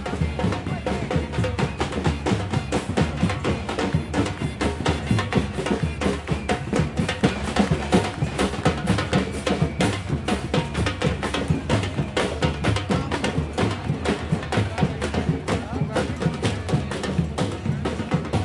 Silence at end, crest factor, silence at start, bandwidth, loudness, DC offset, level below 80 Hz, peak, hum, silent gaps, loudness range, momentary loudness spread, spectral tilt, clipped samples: 0 s; 20 dB; 0 s; 11.5 kHz; -24 LUFS; under 0.1%; -36 dBFS; -4 dBFS; none; none; 2 LU; 4 LU; -6 dB/octave; under 0.1%